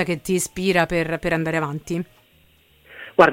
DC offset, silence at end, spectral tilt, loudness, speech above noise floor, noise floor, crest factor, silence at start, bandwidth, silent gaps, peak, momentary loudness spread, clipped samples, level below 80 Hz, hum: under 0.1%; 0 s; -5 dB/octave; -22 LUFS; 34 dB; -56 dBFS; 20 dB; 0 s; 17 kHz; none; -2 dBFS; 10 LU; under 0.1%; -48 dBFS; none